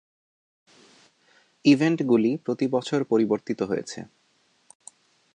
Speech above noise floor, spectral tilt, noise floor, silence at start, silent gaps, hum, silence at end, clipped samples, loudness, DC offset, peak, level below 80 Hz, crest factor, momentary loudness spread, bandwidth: 43 dB; -6 dB/octave; -66 dBFS; 1.65 s; none; none; 1.3 s; under 0.1%; -24 LUFS; under 0.1%; -6 dBFS; -72 dBFS; 20 dB; 9 LU; 10 kHz